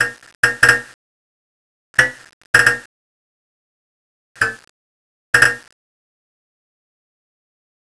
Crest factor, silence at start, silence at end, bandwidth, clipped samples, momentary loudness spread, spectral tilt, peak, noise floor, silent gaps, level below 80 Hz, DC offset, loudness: 22 dB; 0 s; 2.25 s; 11 kHz; under 0.1%; 9 LU; -1.5 dB/octave; 0 dBFS; under -90 dBFS; 0.35-0.43 s, 0.94-1.94 s, 2.33-2.54 s, 2.86-4.35 s, 4.69-5.33 s; -52 dBFS; 0.3%; -15 LUFS